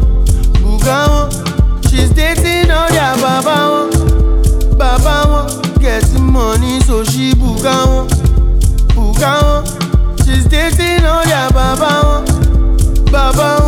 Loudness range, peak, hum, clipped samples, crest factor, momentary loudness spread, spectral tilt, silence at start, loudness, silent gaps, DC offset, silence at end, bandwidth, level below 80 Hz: 1 LU; 0 dBFS; none; under 0.1%; 10 dB; 2 LU; -5 dB/octave; 0 s; -12 LUFS; none; under 0.1%; 0 s; 16 kHz; -12 dBFS